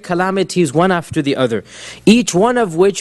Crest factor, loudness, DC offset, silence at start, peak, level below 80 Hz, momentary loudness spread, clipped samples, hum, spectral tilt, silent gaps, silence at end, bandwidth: 14 dB; -15 LUFS; under 0.1%; 0.05 s; 0 dBFS; -50 dBFS; 7 LU; under 0.1%; none; -5 dB/octave; none; 0 s; 12.5 kHz